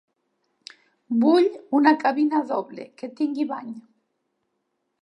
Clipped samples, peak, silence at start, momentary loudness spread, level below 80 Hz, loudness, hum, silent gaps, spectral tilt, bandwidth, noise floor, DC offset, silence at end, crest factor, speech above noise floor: under 0.1%; -4 dBFS; 1.1 s; 19 LU; -84 dBFS; -22 LUFS; none; none; -6 dB/octave; 10.5 kHz; -76 dBFS; under 0.1%; 1.25 s; 22 dB; 54 dB